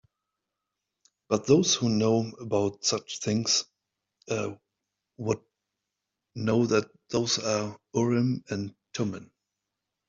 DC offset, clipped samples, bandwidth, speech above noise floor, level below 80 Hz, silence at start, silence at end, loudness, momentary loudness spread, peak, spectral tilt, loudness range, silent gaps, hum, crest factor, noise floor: under 0.1%; under 0.1%; 7.8 kHz; 58 dB; -66 dBFS; 1.3 s; 0.85 s; -27 LUFS; 11 LU; -8 dBFS; -4.5 dB/octave; 5 LU; none; none; 20 dB; -85 dBFS